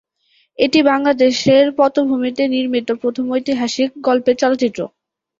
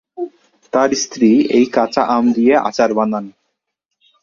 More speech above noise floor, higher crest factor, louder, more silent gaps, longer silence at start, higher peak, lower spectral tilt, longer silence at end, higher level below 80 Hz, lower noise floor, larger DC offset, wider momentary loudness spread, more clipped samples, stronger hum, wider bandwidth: second, 45 dB vs 62 dB; about the same, 14 dB vs 16 dB; about the same, -16 LUFS vs -15 LUFS; neither; first, 0.6 s vs 0.15 s; about the same, -2 dBFS vs 0 dBFS; about the same, -4.5 dB/octave vs -4.5 dB/octave; second, 0.55 s vs 0.9 s; about the same, -60 dBFS vs -58 dBFS; second, -60 dBFS vs -76 dBFS; neither; second, 7 LU vs 16 LU; neither; neither; about the same, 7.8 kHz vs 7.2 kHz